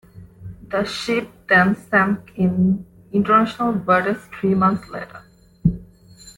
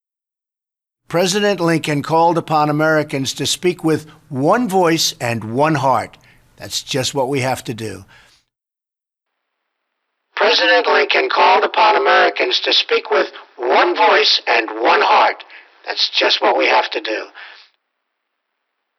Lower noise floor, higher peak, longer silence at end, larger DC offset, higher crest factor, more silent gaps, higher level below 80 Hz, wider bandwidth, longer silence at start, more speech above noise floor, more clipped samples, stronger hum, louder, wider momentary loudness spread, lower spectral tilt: second, -46 dBFS vs -84 dBFS; about the same, -2 dBFS vs -2 dBFS; second, 0.1 s vs 1.45 s; neither; about the same, 18 dB vs 16 dB; neither; first, -46 dBFS vs -60 dBFS; second, 12 kHz vs 15 kHz; second, 0.15 s vs 1.1 s; second, 27 dB vs 69 dB; neither; neither; second, -19 LUFS vs -15 LUFS; first, 17 LU vs 12 LU; first, -7 dB/octave vs -3.5 dB/octave